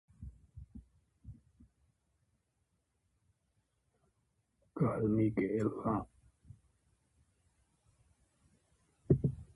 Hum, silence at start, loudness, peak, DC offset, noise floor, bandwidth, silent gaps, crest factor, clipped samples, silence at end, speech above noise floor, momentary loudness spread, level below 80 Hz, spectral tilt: none; 0.2 s; -34 LUFS; -14 dBFS; under 0.1%; -81 dBFS; 11 kHz; none; 26 dB; under 0.1%; 0.1 s; 48 dB; 25 LU; -58 dBFS; -10.5 dB/octave